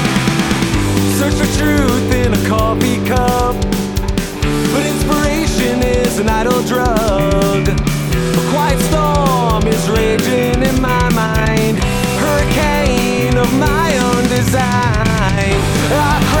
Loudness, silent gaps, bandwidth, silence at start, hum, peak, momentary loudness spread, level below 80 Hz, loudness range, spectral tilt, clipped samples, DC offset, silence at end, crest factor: -14 LUFS; none; over 20 kHz; 0 s; none; -2 dBFS; 2 LU; -22 dBFS; 2 LU; -5 dB/octave; under 0.1%; under 0.1%; 0 s; 12 dB